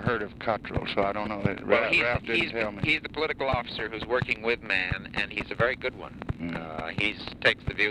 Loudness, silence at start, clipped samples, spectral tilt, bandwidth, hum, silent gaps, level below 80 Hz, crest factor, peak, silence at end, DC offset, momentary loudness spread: -28 LUFS; 0 s; under 0.1%; -6 dB/octave; 11.5 kHz; none; none; -46 dBFS; 20 dB; -8 dBFS; 0 s; under 0.1%; 9 LU